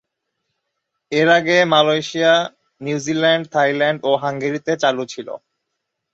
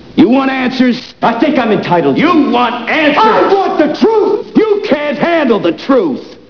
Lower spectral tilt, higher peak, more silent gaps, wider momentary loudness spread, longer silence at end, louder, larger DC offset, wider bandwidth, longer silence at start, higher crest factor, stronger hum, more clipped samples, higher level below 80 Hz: second, -4.5 dB/octave vs -6.5 dB/octave; about the same, 0 dBFS vs 0 dBFS; neither; first, 15 LU vs 5 LU; first, 0.75 s vs 0.15 s; second, -17 LUFS vs -11 LUFS; second, under 0.1% vs 0.4%; first, 8 kHz vs 5.4 kHz; first, 1.1 s vs 0.1 s; first, 18 dB vs 10 dB; neither; second, under 0.1% vs 0.2%; second, -64 dBFS vs -50 dBFS